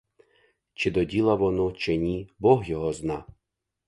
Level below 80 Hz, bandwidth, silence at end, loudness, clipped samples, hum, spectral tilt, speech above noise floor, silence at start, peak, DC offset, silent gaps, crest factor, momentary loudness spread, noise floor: -48 dBFS; 11.5 kHz; 0.55 s; -25 LUFS; under 0.1%; none; -7 dB/octave; 58 dB; 0.8 s; -4 dBFS; under 0.1%; none; 22 dB; 9 LU; -82 dBFS